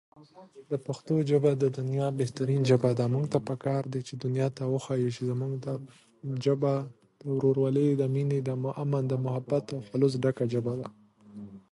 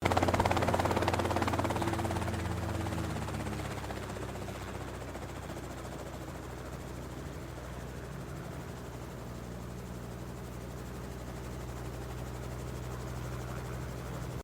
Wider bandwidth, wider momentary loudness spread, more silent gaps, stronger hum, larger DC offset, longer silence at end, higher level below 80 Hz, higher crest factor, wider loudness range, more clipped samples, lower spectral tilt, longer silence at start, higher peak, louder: second, 11.5 kHz vs over 20 kHz; about the same, 12 LU vs 13 LU; neither; neither; neither; first, 0.15 s vs 0 s; second, -70 dBFS vs -48 dBFS; second, 20 dB vs 26 dB; second, 4 LU vs 10 LU; neither; first, -8 dB/octave vs -5.5 dB/octave; first, 0.2 s vs 0 s; about the same, -10 dBFS vs -10 dBFS; first, -29 LUFS vs -37 LUFS